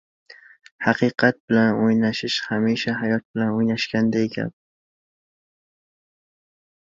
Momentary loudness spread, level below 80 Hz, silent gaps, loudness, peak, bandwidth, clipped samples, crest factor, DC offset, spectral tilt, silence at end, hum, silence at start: 6 LU; -62 dBFS; 0.71-0.79 s, 1.40-1.48 s, 3.25-3.34 s; -21 LUFS; -2 dBFS; 7.6 kHz; under 0.1%; 20 dB; under 0.1%; -6 dB/octave; 2.35 s; none; 0.3 s